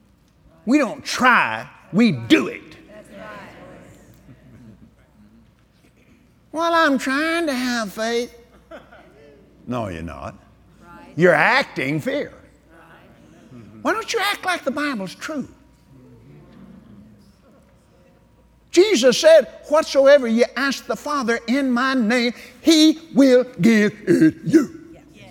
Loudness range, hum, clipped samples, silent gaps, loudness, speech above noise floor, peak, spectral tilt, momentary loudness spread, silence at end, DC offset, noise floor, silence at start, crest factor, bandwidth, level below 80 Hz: 12 LU; none; under 0.1%; none; -18 LUFS; 37 dB; 0 dBFS; -4.5 dB/octave; 17 LU; 0.4 s; under 0.1%; -55 dBFS; 0.65 s; 20 dB; 17.5 kHz; -56 dBFS